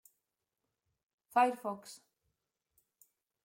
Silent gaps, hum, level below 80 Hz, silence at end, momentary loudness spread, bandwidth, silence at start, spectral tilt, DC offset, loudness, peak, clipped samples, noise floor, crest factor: none; none; under -90 dBFS; 1.5 s; 23 LU; 16.5 kHz; 1.35 s; -4 dB/octave; under 0.1%; -33 LUFS; -18 dBFS; under 0.1%; -88 dBFS; 22 dB